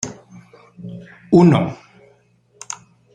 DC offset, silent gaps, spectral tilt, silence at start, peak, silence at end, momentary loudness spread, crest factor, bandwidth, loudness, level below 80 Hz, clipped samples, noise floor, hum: under 0.1%; none; -7 dB/octave; 0.05 s; -2 dBFS; 1.4 s; 26 LU; 18 dB; 9.4 kHz; -15 LUFS; -54 dBFS; under 0.1%; -56 dBFS; none